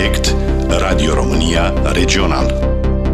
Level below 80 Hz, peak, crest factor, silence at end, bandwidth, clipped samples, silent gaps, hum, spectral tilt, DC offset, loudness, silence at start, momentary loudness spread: -16 dBFS; 0 dBFS; 12 dB; 0 s; 13.5 kHz; under 0.1%; none; none; -5 dB/octave; under 0.1%; -15 LUFS; 0 s; 3 LU